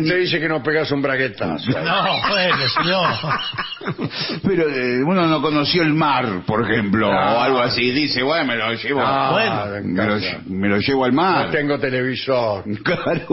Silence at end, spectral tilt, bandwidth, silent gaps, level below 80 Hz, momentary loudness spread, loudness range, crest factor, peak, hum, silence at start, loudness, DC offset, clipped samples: 0 s; -8.5 dB/octave; 6 kHz; none; -50 dBFS; 6 LU; 2 LU; 14 dB; -4 dBFS; none; 0 s; -18 LUFS; under 0.1%; under 0.1%